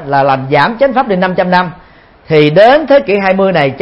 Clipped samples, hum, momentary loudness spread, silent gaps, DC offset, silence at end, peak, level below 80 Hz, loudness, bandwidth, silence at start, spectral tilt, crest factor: 0.3%; none; 6 LU; none; under 0.1%; 0 s; 0 dBFS; -44 dBFS; -9 LUFS; 5.8 kHz; 0 s; -8 dB/octave; 10 dB